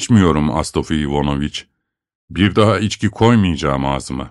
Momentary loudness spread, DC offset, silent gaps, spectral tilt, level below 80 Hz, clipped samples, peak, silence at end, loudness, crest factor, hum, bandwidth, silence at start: 9 LU; under 0.1%; 2.15-2.28 s; -6 dB/octave; -34 dBFS; under 0.1%; 0 dBFS; 0 s; -16 LUFS; 16 dB; none; 12 kHz; 0 s